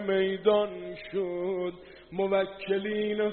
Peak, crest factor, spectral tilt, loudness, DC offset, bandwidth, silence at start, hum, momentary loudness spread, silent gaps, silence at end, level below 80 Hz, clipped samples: -10 dBFS; 18 dB; -4 dB/octave; -29 LUFS; under 0.1%; 4.4 kHz; 0 s; none; 12 LU; none; 0 s; -64 dBFS; under 0.1%